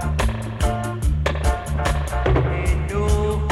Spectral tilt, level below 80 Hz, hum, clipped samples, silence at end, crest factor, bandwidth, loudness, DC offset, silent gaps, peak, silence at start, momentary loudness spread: -6 dB/octave; -22 dBFS; none; under 0.1%; 0 s; 14 dB; 13.5 kHz; -22 LUFS; under 0.1%; none; -6 dBFS; 0 s; 4 LU